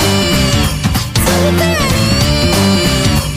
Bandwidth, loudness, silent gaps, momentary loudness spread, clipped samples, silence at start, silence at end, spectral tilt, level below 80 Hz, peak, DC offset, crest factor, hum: 16 kHz; -12 LUFS; none; 3 LU; under 0.1%; 0 s; 0 s; -4.5 dB/octave; -22 dBFS; 0 dBFS; under 0.1%; 12 dB; none